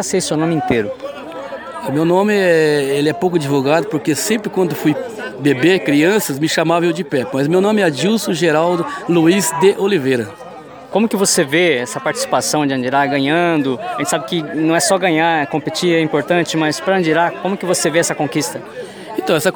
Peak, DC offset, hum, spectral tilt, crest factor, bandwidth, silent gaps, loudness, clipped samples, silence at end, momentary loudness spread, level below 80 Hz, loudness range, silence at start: -2 dBFS; under 0.1%; none; -4.5 dB/octave; 14 dB; over 20 kHz; none; -15 LUFS; under 0.1%; 0 s; 9 LU; -58 dBFS; 2 LU; 0 s